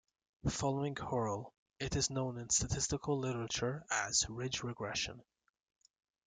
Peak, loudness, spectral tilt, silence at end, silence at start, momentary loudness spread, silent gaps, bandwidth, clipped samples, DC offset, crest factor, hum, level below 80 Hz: -20 dBFS; -37 LUFS; -3.5 dB/octave; 1.05 s; 0.45 s; 7 LU; 1.58-1.66 s; 10 kHz; under 0.1%; under 0.1%; 20 dB; none; -56 dBFS